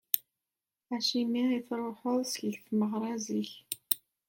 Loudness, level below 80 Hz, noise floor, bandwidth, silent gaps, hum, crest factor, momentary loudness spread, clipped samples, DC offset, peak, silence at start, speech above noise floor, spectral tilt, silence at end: -33 LUFS; -82 dBFS; under -90 dBFS; 17 kHz; none; none; 28 dB; 7 LU; under 0.1%; under 0.1%; -4 dBFS; 0.15 s; over 58 dB; -4 dB/octave; 0.3 s